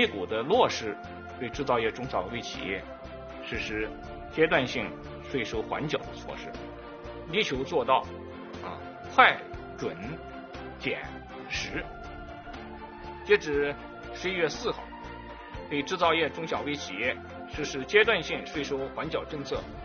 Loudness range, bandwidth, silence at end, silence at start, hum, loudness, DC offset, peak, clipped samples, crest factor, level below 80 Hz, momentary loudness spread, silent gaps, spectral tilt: 5 LU; 6.8 kHz; 0 s; 0 s; none; -29 LUFS; under 0.1%; -2 dBFS; under 0.1%; 28 dB; -50 dBFS; 18 LU; none; -2 dB/octave